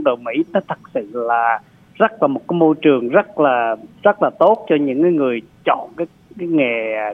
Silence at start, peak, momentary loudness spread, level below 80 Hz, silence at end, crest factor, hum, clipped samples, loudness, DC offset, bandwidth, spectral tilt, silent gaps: 0 s; 0 dBFS; 10 LU; -64 dBFS; 0 s; 16 dB; none; under 0.1%; -17 LUFS; under 0.1%; 3.8 kHz; -8.5 dB/octave; none